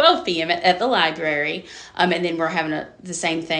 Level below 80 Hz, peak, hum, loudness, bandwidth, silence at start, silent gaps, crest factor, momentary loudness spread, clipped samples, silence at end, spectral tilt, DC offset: -60 dBFS; 0 dBFS; none; -21 LUFS; 10 kHz; 0 s; none; 20 dB; 11 LU; under 0.1%; 0 s; -3.5 dB/octave; under 0.1%